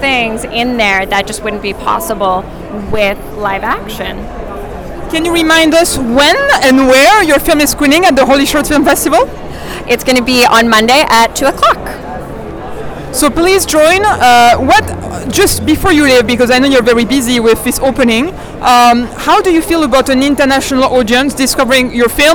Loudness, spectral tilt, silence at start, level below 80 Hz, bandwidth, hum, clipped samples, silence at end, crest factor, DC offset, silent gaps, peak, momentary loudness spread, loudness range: -9 LUFS; -3 dB/octave; 0 s; -28 dBFS; over 20 kHz; none; under 0.1%; 0 s; 8 dB; under 0.1%; none; -2 dBFS; 15 LU; 6 LU